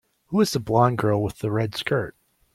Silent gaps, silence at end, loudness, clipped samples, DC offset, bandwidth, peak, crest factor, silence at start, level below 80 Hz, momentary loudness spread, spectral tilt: none; 0.45 s; -23 LUFS; under 0.1%; under 0.1%; 15.5 kHz; -4 dBFS; 18 dB; 0.3 s; -54 dBFS; 7 LU; -6 dB/octave